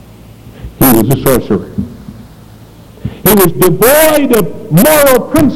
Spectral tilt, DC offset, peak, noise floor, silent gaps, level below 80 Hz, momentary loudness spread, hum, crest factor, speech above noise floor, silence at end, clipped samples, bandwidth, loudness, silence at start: -5 dB/octave; under 0.1%; 0 dBFS; -35 dBFS; none; -32 dBFS; 16 LU; none; 10 dB; 27 dB; 0 s; 1%; over 20 kHz; -8 LUFS; 0 s